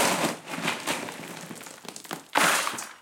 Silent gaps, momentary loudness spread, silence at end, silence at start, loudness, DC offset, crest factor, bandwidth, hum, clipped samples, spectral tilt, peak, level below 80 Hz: none; 18 LU; 0 s; 0 s; -27 LUFS; under 0.1%; 24 dB; 17 kHz; none; under 0.1%; -2 dB/octave; -4 dBFS; -74 dBFS